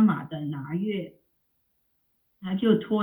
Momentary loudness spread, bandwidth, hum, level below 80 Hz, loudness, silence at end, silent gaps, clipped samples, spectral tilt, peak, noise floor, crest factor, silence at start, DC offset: 13 LU; 3.9 kHz; none; -70 dBFS; -28 LUFS; 0 s; none; under 0.1%; -9.5 dB/octave; -8 dBFS; -73 dBFS; 20 dB; 0 s; under 0.1%